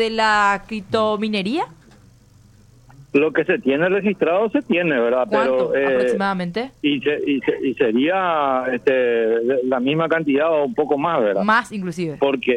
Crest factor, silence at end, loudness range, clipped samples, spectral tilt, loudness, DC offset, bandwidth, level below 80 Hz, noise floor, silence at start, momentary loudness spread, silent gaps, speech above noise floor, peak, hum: 14 dB; 0 s; 3 LU; under 0.1%; -6 dB/octave; -19 LUFS; under 0.1%; 10.5 kHz; -56 dBFS; -50 dBFS; 0 s; 5 LU; none; 31 dB; -6 dBFS; none